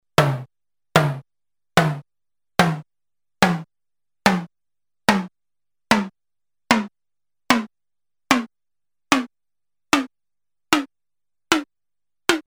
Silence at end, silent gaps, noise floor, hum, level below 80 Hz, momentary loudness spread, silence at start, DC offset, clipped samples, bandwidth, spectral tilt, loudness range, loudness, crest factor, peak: 0.05 s; none; under -90 dBFS; 50 Hz at -60 dBFS; -54 dBFS; 15 LU; 0.2 s; under 0.1%; under 0.1%; 16.5 kHz; -4.5 dB/octave; 2 LU; -21 LUFS; 20 dB; -4 dBFS